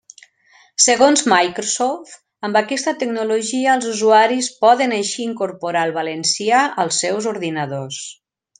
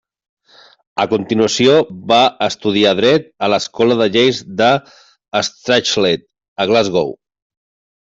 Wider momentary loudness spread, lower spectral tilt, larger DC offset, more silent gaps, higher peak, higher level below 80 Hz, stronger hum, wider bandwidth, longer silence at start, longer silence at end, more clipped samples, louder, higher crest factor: first, 12 LU vs 8 LU; second, -2.5 dB/octave vs -4 dB/octave; neither; second, none vs 6.48-6.56 s; about the same, 0 dBFS vs -2 dBFS; second, -68 dBFS vs -56 dBFS; neither; first, 10.5 kHz vs 8 kHz; second, 0.8 s vs 0.95 s; second, 0.45 s vs 0.85 s; neither; about the same, -17 LUFS vs -15 LUFS; about the same, 18 dB vs 14 dB